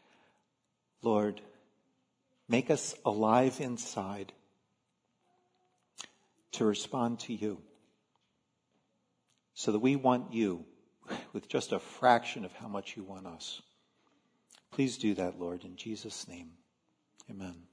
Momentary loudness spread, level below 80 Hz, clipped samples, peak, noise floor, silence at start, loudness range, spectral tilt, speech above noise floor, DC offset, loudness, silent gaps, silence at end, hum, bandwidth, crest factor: 19 LU; -78 dBFS; under 0.1%; -10 dBFS; -81 dBFS; 1.05 s; 6 LU; -5 dB/octave; 48 dB; under 0.1%; -33 LUFS; none; 0.1 s; none; 10.5 kHz; 24 dB